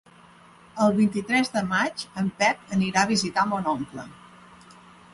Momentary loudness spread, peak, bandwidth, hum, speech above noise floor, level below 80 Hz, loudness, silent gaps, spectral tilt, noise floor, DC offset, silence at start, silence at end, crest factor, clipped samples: 11 LU; -6 dBFS; 11.5 kHz; none; 28 dB; -60 dBFS; -24 LUFS; none; -4.5 dB/octave; -52 dBFS; under 0.1%; 0.75 s; 1 s; 20 dB; under 0.1%